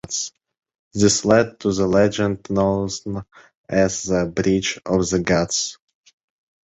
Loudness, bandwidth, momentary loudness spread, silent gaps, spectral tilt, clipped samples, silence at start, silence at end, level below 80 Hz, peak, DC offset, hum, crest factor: -20 LUFS; 8.4 kHz; 11 LU; 0.79-0.91 s, 3.57-3.64 s; -4.5 dB/octave; under 0.1%; 0.05 s; 0.95 s; -44 dBFS; -2 dBFS; under 0.1%; none; 20 dB